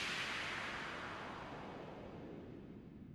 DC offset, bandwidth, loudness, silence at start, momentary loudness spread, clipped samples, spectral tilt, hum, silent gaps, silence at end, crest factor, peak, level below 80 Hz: under 0.1%; over 20 kHz; -46 LUFS; 0 s; 13 LU; under 0.1%; -3.5 dB/octave; none; none; 0 s; 18 dB; -30 dBFS; -66 dBFS